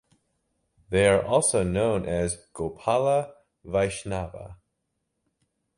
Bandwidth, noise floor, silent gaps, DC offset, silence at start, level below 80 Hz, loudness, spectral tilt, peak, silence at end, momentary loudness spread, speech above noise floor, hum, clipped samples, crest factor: 11.5 kHz; -79 dBFS; none; under 0.1%; 0.9 s; -48 dBFS; -25 LUFS; -4.5 dB/octave; -8 dBFS; 1.25 s; 14 LU; 54 dB; none; under 0.1%; 20 dB